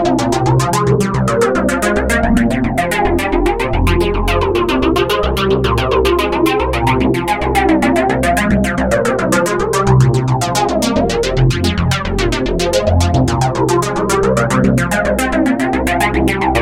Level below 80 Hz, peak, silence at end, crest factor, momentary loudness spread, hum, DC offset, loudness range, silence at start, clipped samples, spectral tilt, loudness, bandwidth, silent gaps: -24 dBFS; 0 dBFS; 0 s; 14 dB; 2 LU; none; 0.8%; 1 LU; 0 s; under 0.1%; -5.5 dB/octave; -14 LUFS; 16.5 kHz; none